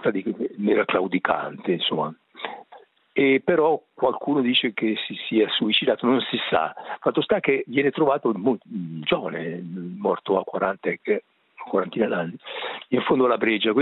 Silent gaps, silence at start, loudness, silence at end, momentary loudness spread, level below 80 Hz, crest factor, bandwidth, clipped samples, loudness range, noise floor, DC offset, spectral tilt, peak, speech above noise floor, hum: none; 0 s; -23 LUFS; 0 s; 11 LU; -66 dBFS; 20 dB; 4.3 kHz; under 0.1%; 4 LU; -51 dBFS; under 0.1%; -9 dB/octave; -4 dBFS; 28 dB; none